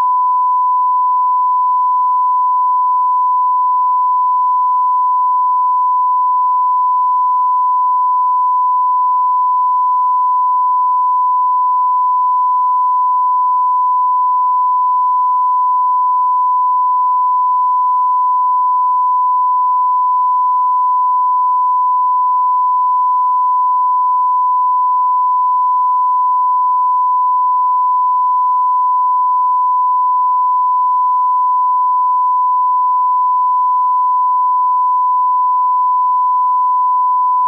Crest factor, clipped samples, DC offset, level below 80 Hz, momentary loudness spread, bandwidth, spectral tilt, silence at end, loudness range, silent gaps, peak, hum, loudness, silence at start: 4 dB; under 0.1%; under 0.1%; under -90 dBFS; 0 LU; 1.2 kHz; 0 dB/octave; 0 s; 0 LU; none; -10 dBFS; none; -13 LUFS; 0 s